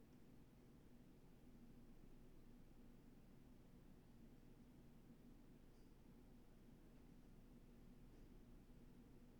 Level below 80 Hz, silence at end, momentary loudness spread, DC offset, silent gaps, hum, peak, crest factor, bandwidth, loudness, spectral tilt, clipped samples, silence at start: -68 dBFS; 0 s; 2 LU; under 0.1%; none; none; -54 dBFS; 12 dB; 19.5 kHz; -68 LUFS; -6.5 dB/octave; under 0.1%; 0 s